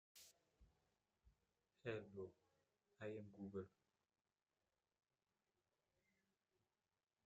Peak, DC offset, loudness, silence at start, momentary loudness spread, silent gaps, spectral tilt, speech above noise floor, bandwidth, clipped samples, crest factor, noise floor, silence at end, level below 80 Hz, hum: -34 dBFS; under 0.1%; -55 LUFS; 0.15 s; 14 LU; none; -6 dB/octave; over 37 dB; 7.6 kHz; under 0.1%; 26 dB; under -90 dBFS; 3.6 s; -86 dBFS; none